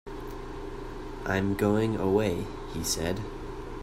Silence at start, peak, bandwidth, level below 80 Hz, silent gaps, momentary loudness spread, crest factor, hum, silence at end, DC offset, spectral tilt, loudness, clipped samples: 0.05 s; -12 dBFS; 16 kHz; -42 dBFS; none; 14 LU; 18 dB; none; 0 s; under 0.1%; -5 dB/octave; -30 LUFS; under 0.1%